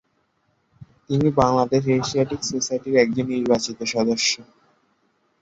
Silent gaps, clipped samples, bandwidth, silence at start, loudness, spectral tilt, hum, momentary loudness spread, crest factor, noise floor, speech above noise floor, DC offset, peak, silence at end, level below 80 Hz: none; under 0.1%; 8 kHz; 0.8 s; -21 LUFS; -4.5 dB/octave; none; 6 LU; 20 dB; -68 dBFS; 47 dB; under 0.1%; -2 dBFS; 1 s; -52 dBFS